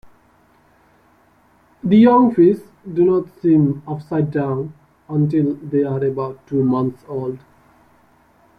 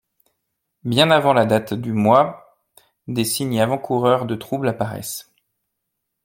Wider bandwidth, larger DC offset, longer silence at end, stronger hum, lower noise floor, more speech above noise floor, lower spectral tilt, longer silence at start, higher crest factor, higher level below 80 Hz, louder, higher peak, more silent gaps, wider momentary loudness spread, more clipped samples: second, 5 kHz vs 17 kHz; neither; first, 1.2 s vs 1.05 s; neither; second, -55 dBFS vs -78 dBFS; second, 38 dB vs 59 dB; first, -10.5 dB/octave vs -5 dB/octave; second, 0.05 s vs 0.85 s; about the same, 16 dB vs 20 dB; about the same, -56 dBFS vs -60 dBFS; about the same, -18 LUFS vs -19 LUFS; about the same, -2 dBFS vs 0 dBFS; neither; about the same, 14 LU vs 12 LU; neither